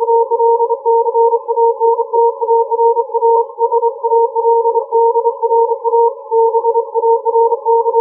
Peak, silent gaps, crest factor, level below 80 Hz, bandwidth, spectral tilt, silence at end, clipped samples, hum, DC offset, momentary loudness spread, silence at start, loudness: -2 dBFS; none; 10 dB; under -90 dBFS; 1.2 kHz; -9 dB/octave; 0 s; under 0.1%; none; under 0.1%; 2 LU; 0 s; -13 LUFS